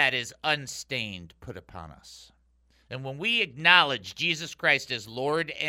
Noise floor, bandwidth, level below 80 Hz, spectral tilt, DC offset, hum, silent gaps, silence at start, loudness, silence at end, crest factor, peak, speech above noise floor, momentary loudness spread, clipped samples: -65 dBFS; 16 kHz; -62 dBFS; -2.5 dB/octave; under 0.1%; none; none; 0 s; -25 LUFS; 0 s; 26 dB; -2 dBFS; 36 dB; 24 LU; under 0.1%